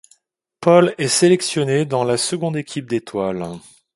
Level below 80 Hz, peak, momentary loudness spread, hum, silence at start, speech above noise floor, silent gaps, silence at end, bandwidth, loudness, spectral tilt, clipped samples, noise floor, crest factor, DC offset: -60 dBFS; 0 dBFS; 12 LU; none; 0.6 s; 47 dB; none; 0.35 s; 11.5 kHz; -18 LUFS; -4.5 dB/octave; under 0.1%; -64 dBFS; 18 dB; under 0.1%